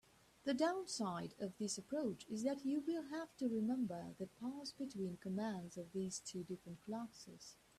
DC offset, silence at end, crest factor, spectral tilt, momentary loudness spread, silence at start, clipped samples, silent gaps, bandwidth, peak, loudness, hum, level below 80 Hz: under 0.1%; 0.25 s; 18 dB; -5 dB/octave; 10 LU; 0.45 s; under 0.1%; none; 14 kHz; -26 dBFS; -44 LUFS; none; -80 dBFS